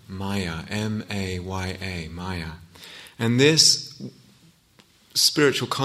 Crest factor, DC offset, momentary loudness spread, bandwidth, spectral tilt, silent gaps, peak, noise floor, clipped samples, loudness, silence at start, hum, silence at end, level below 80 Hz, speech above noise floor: 24 dB; under 0.1%; 24 LU; 16 kHz; -3 dB/octave; none; -2 dBFS; -57 dBFS; under 0.1%; -22 LUFS; 0.1 s; none; 0 s; -52 dBFS; 34 dB